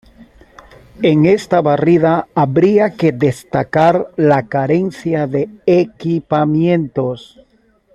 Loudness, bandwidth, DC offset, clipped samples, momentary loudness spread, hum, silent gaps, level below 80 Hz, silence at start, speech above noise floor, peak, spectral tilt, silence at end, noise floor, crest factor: -14 LUFS; 12 kHz; under 0.1%; under 0.1%; 7 LU; none; none; -50 dBFS; 0.2 s; 41 dB; -2 dBFS; -8 dB/octave; 0.75 s; -54 dBFS; 14 dB